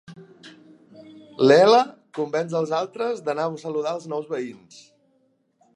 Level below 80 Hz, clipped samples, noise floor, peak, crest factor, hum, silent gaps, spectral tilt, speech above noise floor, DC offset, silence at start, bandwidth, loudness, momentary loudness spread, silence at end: -76 dBFS; under 0.1%; -66 dBFS; -2 dBFS; 22 dB; none; none; -5.5 dB/octave; 45 dB; under 0.1%; 0.1 s; 10.5 kHz; -22 LUFS; 16 LU; 1.25 s